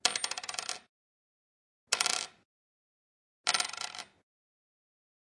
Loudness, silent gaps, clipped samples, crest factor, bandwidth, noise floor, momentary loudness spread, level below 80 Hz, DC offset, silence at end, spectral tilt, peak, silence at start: -32 LUFS; 0.89-1.87 s, 2.45-3.44 s; under 0.1%; 34 dB; 11.5 kHz; under -90 dBFS; 15 LU; -84 dBFS; under 0.1%; 1.2 s; 2 dB/octave; -6 dBFS; 0.05 s